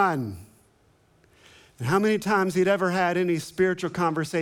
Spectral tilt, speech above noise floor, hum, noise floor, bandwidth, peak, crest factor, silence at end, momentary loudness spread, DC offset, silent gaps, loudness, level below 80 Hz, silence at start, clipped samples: -6 dB/octave; 38 dB; none; -62 dBFS; 16.5 kHz; -8 dBFS; 16 dB; 0 s; 9 LU; under 0.1%; none; -24 LUFS; -62 dBFS; 0 s; under 0.1%